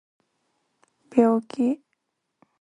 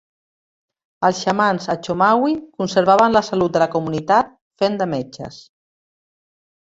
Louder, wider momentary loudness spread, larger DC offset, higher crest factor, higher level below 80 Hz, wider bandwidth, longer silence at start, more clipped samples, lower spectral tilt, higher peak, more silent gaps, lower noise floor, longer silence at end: second, -23 LUFS vs -18 LUFS; second, 7 LU vs 11 LU; neither; about the same, 22 dB vs 18 dB; second, -72 dBFS vs -56 dBFS; first, 9.6 kHz vs 8 kHz; first, 1.15 s vs 1 s; neither; first, -7.5 dB/octave vs -5.5 dB/octave; about the same, -4 dBFS vs -2 dBFS; second, none vs 4.41-4.51 s; second, -77 dBFS vs under -90 dBFS; second, 0.85 s vs 1.3 s